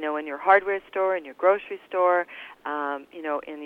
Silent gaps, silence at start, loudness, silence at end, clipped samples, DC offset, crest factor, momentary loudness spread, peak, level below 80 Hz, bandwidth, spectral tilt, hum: none; 0 s; -25 LUFS; 0 s; under 0.1%; under 0.1%; 20 dB; 12 LU; -6 dBFS; -70 dBFS; 4.4 kHz; -5.5 dB/octave; none